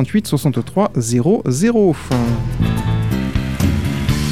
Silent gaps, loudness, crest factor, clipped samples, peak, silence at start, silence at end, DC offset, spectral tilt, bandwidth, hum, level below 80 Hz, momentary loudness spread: none; -17 LUFS; 12 dB; under 0.1%; -4 dBFS; 0 s; 0 s; 1%; -6.5 dB/octave; 16 kHz; none; -30 dBFS; 4 LU